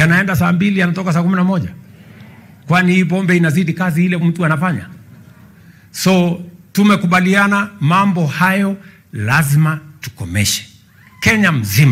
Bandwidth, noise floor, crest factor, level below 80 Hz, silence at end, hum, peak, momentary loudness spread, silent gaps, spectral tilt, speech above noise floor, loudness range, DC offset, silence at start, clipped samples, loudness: 16 kHz; -44 dBFS; 12 dB; -50 dBFS; 0 s; none; -2 dBFS; 10 LU; none; -5.5 dB/octave; 31 dB; 3 LU; under 0.1%; 0 s; under 0.1%; -14 LUFS